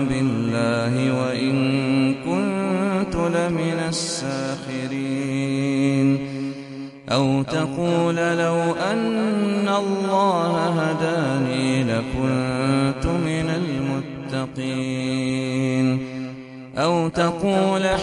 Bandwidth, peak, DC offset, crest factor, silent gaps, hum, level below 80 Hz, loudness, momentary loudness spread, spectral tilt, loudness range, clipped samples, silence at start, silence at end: 11.5 kHz; -4 dBFS; under 0.1%; 16 dB; none; none; -44 dBFS; -22 LUFS; 7 LU; -6 dB/octave; 3 LU; under 0.1%; 0 s; 0 s